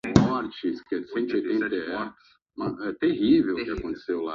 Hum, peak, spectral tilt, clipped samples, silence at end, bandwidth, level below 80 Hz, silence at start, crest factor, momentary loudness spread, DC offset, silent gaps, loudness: none; 0 dBFS; -7 dB/octave; under 0.1%; 0 s; 7.8 kHz; -50 dBFS; 0.05 s; 26 dB; 12 LU; under 0.1%; none; -26 LUFS